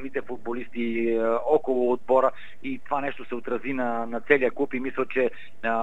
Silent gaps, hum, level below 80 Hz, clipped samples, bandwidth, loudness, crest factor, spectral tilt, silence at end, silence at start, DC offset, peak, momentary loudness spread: none; none; -66 dBFS; under 0.1%; 8 kHz; -26 LUFS; 24 dB; -7 dB/octave; 0 s; 0 s; 2%; -2 dBFS; 11 LU